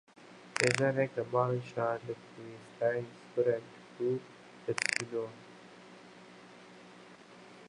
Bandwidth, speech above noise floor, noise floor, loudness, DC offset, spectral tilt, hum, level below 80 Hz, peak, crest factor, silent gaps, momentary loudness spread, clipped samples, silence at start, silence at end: 11.5 kHz; 21 dB; -54 dBFS; -34 LUFS; under 0.1%; -4.5 dB/octave; 60 Hz at -60 dBFS; -76 dBFS; -10 dBFS; 26 dB; none; 23 LU; under 0.1%; 0.2 s; 0 s